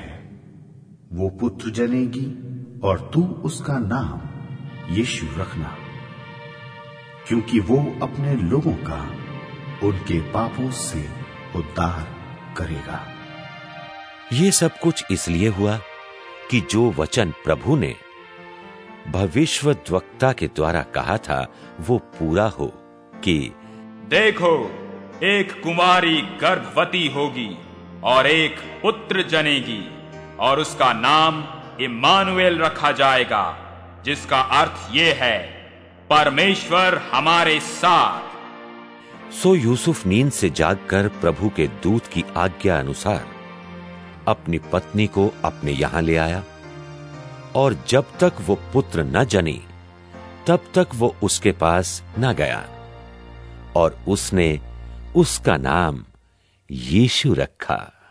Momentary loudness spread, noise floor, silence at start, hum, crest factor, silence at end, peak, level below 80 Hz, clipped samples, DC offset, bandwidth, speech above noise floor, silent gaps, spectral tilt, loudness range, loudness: 21 LU; -59 dBFS; 0 s; none; 20 dB; 0.25 s; 0 dBFS; -42 dBFS; under 0.1%; under 0.1%; 11 kHz; 39 dB; none; -4.5 dB/octave; 7 LU; -20 LUFS